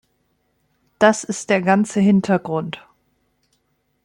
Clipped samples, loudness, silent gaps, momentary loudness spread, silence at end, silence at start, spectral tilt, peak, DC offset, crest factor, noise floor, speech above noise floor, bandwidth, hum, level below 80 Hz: under 0.1%; -18 LUFS; none; 10 LU; 1.25 s; 1 s; -5.5 dB/octave; -2 dBFS; under 0.1%; 18 dB; -68 dBFS; 50 dB; 11 kHz; 50 Hz at -60 dBFS; -62 dBFS